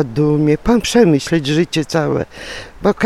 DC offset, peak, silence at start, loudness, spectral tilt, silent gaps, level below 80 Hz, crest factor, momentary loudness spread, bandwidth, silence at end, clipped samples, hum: under 0.1%; 0 dBFS; 0 s; -15 LUFS; -6 dB/octave; none; -36 dBFS; 14 dB; 11 LU; 14.5 kHz; 0 s; under 0.1%; none